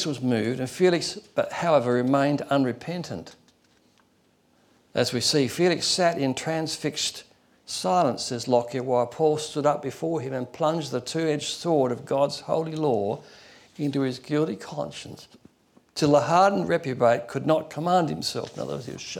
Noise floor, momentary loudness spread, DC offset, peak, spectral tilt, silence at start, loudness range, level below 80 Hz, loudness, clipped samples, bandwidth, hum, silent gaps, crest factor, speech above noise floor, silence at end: -64 dBFS; 11 LU; under 0.1%; -8 dBFS; -5 dB/octave; 0 s; 4 LU; -66 dBFS; -25 LUFS; under 0.1%; 17 kHz; none; none; 18 dB; 39 dB; 0 s